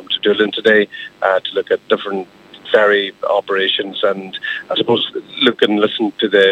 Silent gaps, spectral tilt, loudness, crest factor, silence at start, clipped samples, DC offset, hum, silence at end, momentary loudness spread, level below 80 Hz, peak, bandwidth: none; -5.5 dB/octave; -16 LUFS; 16 dB; 0 s; under 0.1%; under 0.1%; none; 0 s; 10 LU; -64 dBFS; 0 dBFS; 8.4 kHz